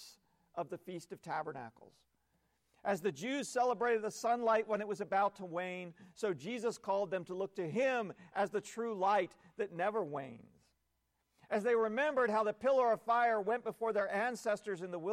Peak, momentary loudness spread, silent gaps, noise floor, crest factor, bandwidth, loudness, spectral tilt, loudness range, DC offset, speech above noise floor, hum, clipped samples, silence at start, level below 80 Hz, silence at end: -22 dBFS; 12 LU; none; -82 dBFS; 14 dB; 15.5 kHz; -36 LUFS; -5 dB/octave; 5 LU; under 0.1%; 46 dB; none; under 0.1%; 0 s; -80 dBFS; 0 s